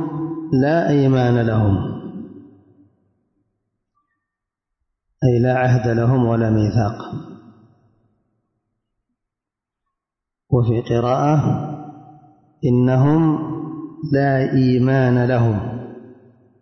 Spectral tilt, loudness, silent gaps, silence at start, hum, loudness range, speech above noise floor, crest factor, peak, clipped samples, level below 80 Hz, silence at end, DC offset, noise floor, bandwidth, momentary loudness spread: -9 dB/octave; -18 LUFS; none; 0 s; none; 9 LU; 69 dB; 16 dB; -4 dBFS; under 0.1%; -48 dBFS; 0.5 s; under 0.1%; -85 dBFS; 6.4 kHz; 15 LU